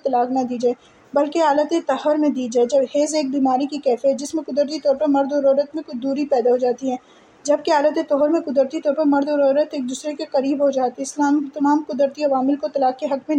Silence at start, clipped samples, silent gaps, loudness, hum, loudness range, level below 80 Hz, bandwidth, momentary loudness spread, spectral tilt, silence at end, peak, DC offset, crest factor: 0.05 s; under 0.1%; none; -20 LUFS; none; 1 LU; -70 dBFS; 10.5 kHz; 7 LU; -4 dB/octave; 0 s; -6 dBFS; under 0.1%; 14 dB